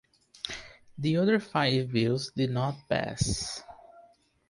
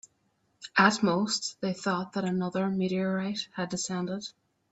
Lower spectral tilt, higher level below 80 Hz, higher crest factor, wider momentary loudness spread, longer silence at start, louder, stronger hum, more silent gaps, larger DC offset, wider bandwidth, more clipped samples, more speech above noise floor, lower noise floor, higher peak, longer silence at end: about the same, -5 dB/octave vs -4.5 dB/octave; first, -52 dBFS vs -70 dBFS; about the same, 18 dB vs 22 dB; about the same, 13 LU vs 11 LU; second, 0.45 s vs 0.6 s; about the same, -29 LUFS vs -29 LUFS; neither; neither; neither; first, 11.5 kHz vs 8.2 kHz; neither; second, 32 dB vs 44 dB; second, -60 dBFS vs -73 dBFS; second, -12 dBFS vs -8 dBFS; about the same, 0.5 s vs 0.4 s